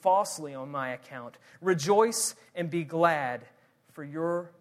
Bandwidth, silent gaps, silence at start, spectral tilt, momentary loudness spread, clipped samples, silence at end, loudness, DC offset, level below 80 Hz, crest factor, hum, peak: 15.5 kHz; none; 0.05 s; -4 dB/octave; 17 LU; under 0.1%; 0.1 s; -29 LUFS; under 0.1%; -78 dBFS; 20 dB; none; -10 dBFS